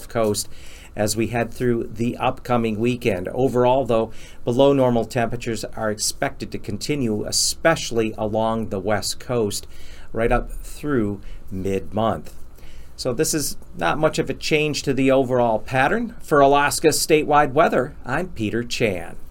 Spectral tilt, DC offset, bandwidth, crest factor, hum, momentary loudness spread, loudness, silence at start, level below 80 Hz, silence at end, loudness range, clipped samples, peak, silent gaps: -4.5 dB/octave; under 0.1%; 17 kHz; 18 dB; none; 11 LU; -21 LUFS; 0 s; -38 dBFS; 0 s; 7 LU; under 0.1%; -2 dBFS; none